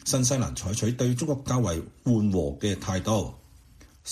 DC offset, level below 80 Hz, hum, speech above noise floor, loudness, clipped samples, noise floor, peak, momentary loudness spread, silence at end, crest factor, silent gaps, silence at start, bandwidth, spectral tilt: under 0.1%; -46 dBFS; none; 27 dB; -27 LUFS; under 0.1%; -53 dBFS; -10 dBFS; 6 LU; 0 s; 16 dB; none; 0 s; 14.5 kHz; -5 dB/octave